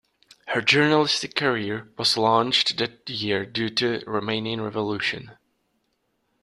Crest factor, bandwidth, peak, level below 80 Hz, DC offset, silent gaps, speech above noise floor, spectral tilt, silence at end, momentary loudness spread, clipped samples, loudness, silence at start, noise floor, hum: 24 dB; 12.5 kHz; -2 dBFS; -64 dBFS; under 0.1%; none; 49 dB; -4 dB/octave; 1.1 s; 9 LU; under 0.1%; -23 LUFS; 0.45 s; -72 dBFS; none